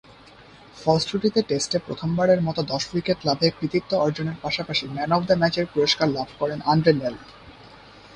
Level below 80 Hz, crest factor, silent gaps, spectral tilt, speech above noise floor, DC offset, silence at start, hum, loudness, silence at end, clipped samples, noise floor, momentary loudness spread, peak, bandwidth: -54 dBFS; 20 dB; none; -5 dB/octave; 26 dB; under 0.1%; 0.75 s; none; -23 LUFS; 0 s; under 0.1%; -48 dBFS; 7 LU; -4 dBFS; 10.5 kHz